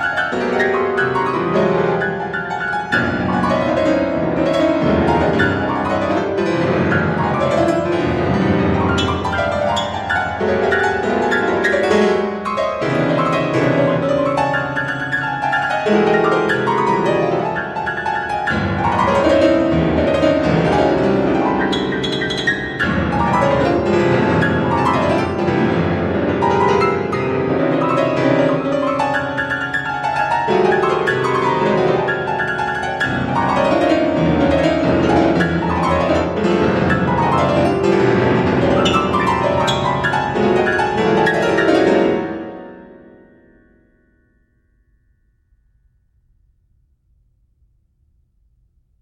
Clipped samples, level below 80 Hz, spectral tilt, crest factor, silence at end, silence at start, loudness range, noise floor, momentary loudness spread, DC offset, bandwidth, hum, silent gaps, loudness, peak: under 0.1%; -40 dBFS; -6.5 dB/octave; 14 dB; 6.1 s; 0 s; 2 LU; -59 dBFS; 5 LU; under 0.1%; 11.5 kHz; none; none; -16 LUFS; -2 dBFS